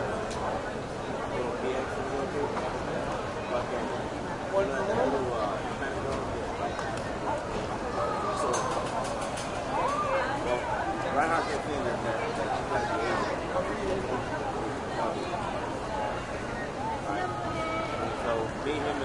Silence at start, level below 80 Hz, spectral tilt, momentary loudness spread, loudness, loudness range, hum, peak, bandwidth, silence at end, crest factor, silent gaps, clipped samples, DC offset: 0 s; -48 dBFS; -5 dB/octave; 5 LU; -31 LUFS; 3 LU; none; -12 dBFS; 11.5 kHz; 0 s; 18 dB; none; under 0.1%; under 0.1%